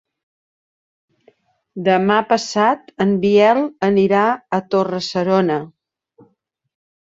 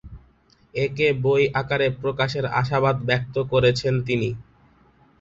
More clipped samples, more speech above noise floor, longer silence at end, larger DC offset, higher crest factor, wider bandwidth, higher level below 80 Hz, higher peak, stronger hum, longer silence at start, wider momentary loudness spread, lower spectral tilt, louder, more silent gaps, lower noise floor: neither; first, 47 dB vs 36 dB; first, 1.3 s vs 0.8 s; neither; about the same, 16 dB vs 18 dB; about the same, 7.8 kHz vs 7.8 kHz; second, -62 dBFS vs -48 dBFS; first, -2 dBFS vs -6 dBFS; neither; first, 1.75 s vs 0.05 s; about the same, 8 LU vs 7 LU; about the same, -6 dB/octave vs -6.5 dB/octave; first, -17 LUFS vs -22 LUFS; neither; first, -63 dBFS vs -58 dBFS